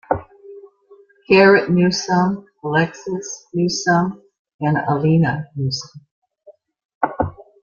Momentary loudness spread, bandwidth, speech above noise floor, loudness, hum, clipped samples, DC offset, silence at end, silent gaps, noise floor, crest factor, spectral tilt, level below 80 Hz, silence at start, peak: 14 LU; 7.4 kHz; 33 dB; -18 LUFS; none; under 0.1%; under 0.1%; 0.3 s; 4.39-4.45 s, 4.54-4.59 s, 6.11-6.22 s, 6.85-6.89 s, 6.95-7.01 s; -50 dBFS; 18 dB; -5.5 dB/octave; -52 dBFS; 0.1 s; 0 dBFS